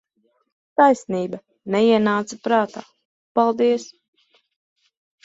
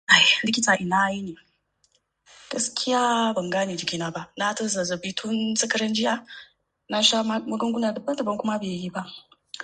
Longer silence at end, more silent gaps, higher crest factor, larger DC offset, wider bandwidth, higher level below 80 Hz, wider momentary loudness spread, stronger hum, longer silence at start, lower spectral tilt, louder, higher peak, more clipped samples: first, 1.4 s vs 0 s; first, 3.05-3.35 s vs none; about the same, 20 dB vs 24 dB; neither; second, 8 kHz vs 11 kHz; about the same, -68 dBFS vs -66 dBFS; about the same, 13 LU vs 13 LU; neither; first, 0.8 s vs 0.1 s; first, -5.5 dB/octave vs -2.5 dB/octave; first, -20 LUFS vs -23 LUFS; about the same, -2 dBFS vs 0 dBFS; neither